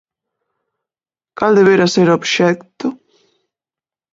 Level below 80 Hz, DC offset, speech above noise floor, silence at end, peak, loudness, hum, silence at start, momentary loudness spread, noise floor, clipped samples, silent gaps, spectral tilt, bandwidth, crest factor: -60 dBFS; under 0.1%; over 77 dB; 1.15 s; 0 dBFS; -14 LUFS; none; 1.4 s; 14 LU; under -90 dBFS; under 0.1%; none; -5 dB/octave; 7.8 kHz; 16 dB